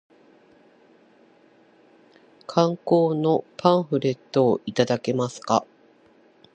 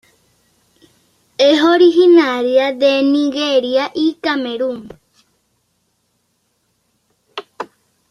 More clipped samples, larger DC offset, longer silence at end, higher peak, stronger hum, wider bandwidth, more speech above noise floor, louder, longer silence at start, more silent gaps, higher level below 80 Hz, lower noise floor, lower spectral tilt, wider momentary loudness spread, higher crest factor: neither; neither; first, 0.9 s vs 0.45 s; about the same, -2 dBFS vs 0 dBFS; neither; about the same, 9 kHz vs 9.8 kHz; second, 35 dB vs 52 dB; second, -23 LUFS vs -13 LUFS; first, 2.5 s vs 1.4 s; neither; second, -70 dBFS vs -64 dBFS; second, -57 dBFS vs -65 dBFS; first, -6.5 dB/octave vs -3.5 dB/octave; second, 5 LU vs 22 LU; first, 22 dB vs 16 dB